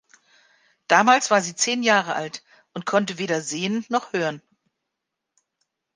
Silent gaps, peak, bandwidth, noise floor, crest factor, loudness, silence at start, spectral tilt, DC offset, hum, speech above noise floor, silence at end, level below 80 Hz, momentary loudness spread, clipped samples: none; -2 dBFS; 10.5 kHz; -82 dBFS; 22 dB; -21 LUFS; 0.9 s; -3 dB/octave; under 0.1%; none; 61 dB; 1.6 s; -76 dBFS; 16 LU; under 0.1%